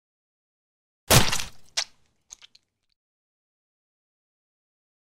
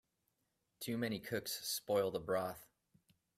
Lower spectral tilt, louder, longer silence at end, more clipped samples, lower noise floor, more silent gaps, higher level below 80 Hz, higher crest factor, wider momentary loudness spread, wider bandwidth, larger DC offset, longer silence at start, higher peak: second, -2.5 dB/octave vs -4 dB/octave; first, -22 LUFS vs -40 LUFS; first, 3.25 s vs 0.75 s; neither; second, -64 dBFS vs -84 dBFS; neither; first, -44 dBFS vs -74 dBFS; first, 26 dB vs 18 dB; first, 12 LU vs 9 LU; about the same, 16 kHz vs 16 kHz; neither; first, 1.1 s vs 0.8 s; first, -2 dBFS vs -24 dBFS